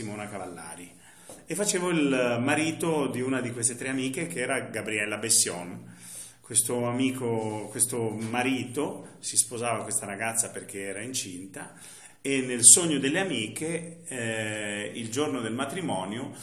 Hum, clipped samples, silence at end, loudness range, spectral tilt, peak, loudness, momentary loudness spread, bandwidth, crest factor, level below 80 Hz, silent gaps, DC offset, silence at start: none; under 0.1%; 0 s; 7 LU; -2.5 dB/octave; 0 dBFS; -26 LUFS; 16 LU; 15 kHz; 28 dB; -72 dBFS; none; under 0.1%; 0 s